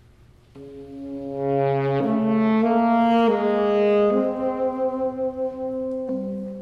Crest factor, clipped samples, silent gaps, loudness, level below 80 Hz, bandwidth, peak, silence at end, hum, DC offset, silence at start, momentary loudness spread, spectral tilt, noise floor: 14 dB; under 0.1%; none; -22 LUFS; -56 dBFS; 5.6 kHz; -8 dBFS; 0 s; none; under 0.1%; 0.55 s; 13 LU; -9 dB/octave; -52 dBFS